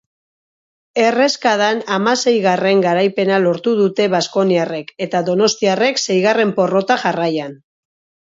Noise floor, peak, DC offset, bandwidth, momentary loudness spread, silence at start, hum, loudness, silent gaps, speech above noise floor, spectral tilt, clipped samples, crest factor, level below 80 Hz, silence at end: under -90 dBFS; 0 dBFS; under 0.1%; 7.8 kHz; 6 LU; 0.95 s; none; -16 LUFS; none; over 75 dB; -4.5 dB/octave; under 0.1%; 16 dB; -66 dBFS; 0.75 s